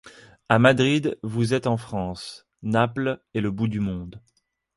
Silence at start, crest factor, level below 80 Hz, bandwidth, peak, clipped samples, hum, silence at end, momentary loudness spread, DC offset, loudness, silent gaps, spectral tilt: 0.05 s; 22 dB; -52 dBFS; 11.5 kHz; -2 dBFS; under 0.1%; none; 0.6 s; 17 LU; under 0.1%; -23 LUFS; none; -6.5 dB/octave